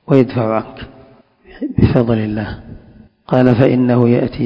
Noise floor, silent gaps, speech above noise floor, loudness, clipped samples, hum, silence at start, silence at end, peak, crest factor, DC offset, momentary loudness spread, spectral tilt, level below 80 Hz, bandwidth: -45 dBFS; none; 32 dB; -14 LUFS; 0.5%; none; 0.1 s; 0 s; 0 dBFS; 14 dB; under 0.1%; 19 LU; -10.5 dB/octave; -34 dBFS; 5.4 kHz